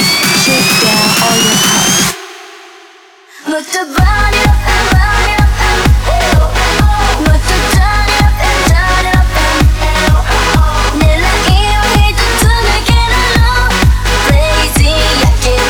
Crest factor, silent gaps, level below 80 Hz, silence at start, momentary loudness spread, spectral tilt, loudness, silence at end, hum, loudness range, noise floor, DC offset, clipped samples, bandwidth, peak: 10 dB; none; -12 dBFS; 0 s; 4 LU; -3.5 dB/octave; -9 LUFS; 0 s; none; 2 LU; -39 dBFS; 1%; under 0.1%; over 20 kHz; 0 dBFS